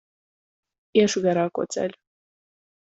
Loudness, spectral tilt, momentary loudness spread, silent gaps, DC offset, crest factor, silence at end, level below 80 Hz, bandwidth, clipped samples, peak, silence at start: -23 LUFS; -5 dB/octave; 9 LU; none; under 0.1%; 20 dB; 0.9 s; -68 dBFS; 8.2 kHz; under 0.1%; -6 dBFS; 0.95 s